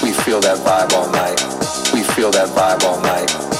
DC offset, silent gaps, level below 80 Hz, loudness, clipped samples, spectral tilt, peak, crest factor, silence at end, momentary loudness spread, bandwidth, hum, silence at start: under 0.1%; none; -50 dBFS; -15 LUFS; under 0.1%; -2.5 dB/octave; -2 dBFS; 14 dB; 0 s; 4 LU; 16.5 kHz; none; 0 s